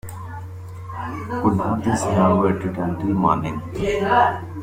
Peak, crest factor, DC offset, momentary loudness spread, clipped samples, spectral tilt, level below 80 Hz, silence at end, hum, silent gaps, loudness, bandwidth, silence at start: -4 dBFS; 18 dB; under 0.1%; 17 LU; under 0.1%; -7 dB/octave; -44 dBFS; 0 s; none; none; -21 LUFS; 16 kHz; 0.05 s